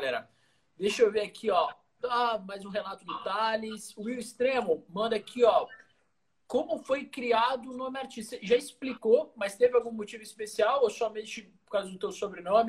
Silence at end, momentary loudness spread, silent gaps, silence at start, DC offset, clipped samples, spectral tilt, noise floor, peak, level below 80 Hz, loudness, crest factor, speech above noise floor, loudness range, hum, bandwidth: 0 s; 13 LU; none; 0 s; under 0.1%; under 0.1%; -3.5 dB/octave; -77 dBFS; -10 dBFS; -72 dBFS; -30 LUFS; 20 dB; 48 dB; 3 LU; none; 12.5 kHz